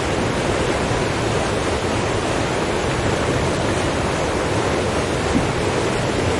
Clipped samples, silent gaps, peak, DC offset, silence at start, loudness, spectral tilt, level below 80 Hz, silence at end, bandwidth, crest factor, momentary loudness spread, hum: under 0.1%; none; -6 dBFS; under 0.1%; 0 s; -20 LUFS; -5 dB/octave; -34 dBFS; 0 s; 11.5 kHz; 14 dB; 1 LU; none